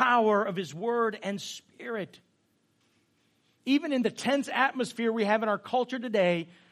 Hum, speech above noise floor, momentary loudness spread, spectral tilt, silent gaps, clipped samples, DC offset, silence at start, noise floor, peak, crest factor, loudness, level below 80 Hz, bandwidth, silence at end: none; 42 dB; 11 LU; -5 dB/octave; none; under 0.1%; under 0.1%; 0 s; -71 dBFS; -8 dBFS; 20 dB; -28 LUFS; -82 dBFS; 15 kHz; 0.25 s